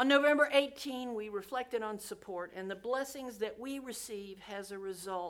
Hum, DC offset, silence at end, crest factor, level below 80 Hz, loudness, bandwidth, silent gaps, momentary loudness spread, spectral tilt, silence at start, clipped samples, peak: none; under 0.1%; 0 s; 22 dB; -72 dBFS; -35 LUFS; 17.5 kHz; none; 16 LU; -3 dB/octave; 0 s; under 0.1%; -14 dBFS